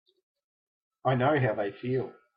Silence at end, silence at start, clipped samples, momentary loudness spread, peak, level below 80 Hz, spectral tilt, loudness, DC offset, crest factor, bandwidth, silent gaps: 0.25 s; 1.05 s; under 0.1%; 8 LU; -14 dBFS; -68 dBFS; -11 dB/octave; -29 LUFS; under 0.1%; 18 dB; 5 kHz; none